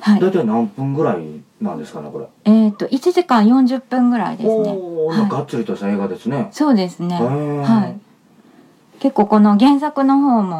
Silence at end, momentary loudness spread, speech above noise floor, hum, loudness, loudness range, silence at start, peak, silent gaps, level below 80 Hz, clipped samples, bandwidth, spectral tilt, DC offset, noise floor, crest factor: 0 s; 13 LU; 34 dB; none; -16 LUFS; 4 LU; 0 s; -2 dBFS; none; -66 dBFS; under 0.1%; 11 kHz; -7.5 dB/octave; under 0.1%; -49 dBFS; 14 dB